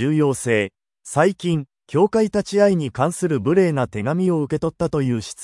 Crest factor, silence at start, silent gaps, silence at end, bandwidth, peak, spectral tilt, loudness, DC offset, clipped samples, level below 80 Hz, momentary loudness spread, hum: 16 dB; 0 s; none; 0 s; 12 kHz; -2 dBFS; -6.5 dB/octave; -20 LUFS; under 0.1%; under 0.1%; -52 dBFS; 6 LU; none